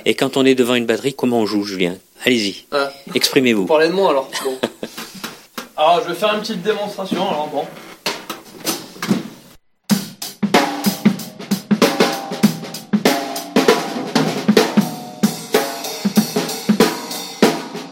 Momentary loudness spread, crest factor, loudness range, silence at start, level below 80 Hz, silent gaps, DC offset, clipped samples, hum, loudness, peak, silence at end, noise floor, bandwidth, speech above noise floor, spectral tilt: 11 LU; 18 dB; 5 LU; 0 s; -60 dBFS; none; under 0.1%; under 0.1%; none; -18 LUFS; 0 dBFS; 0 s; -47 dBFS; 17 kHz; 30 dB; -4.5 dB/octave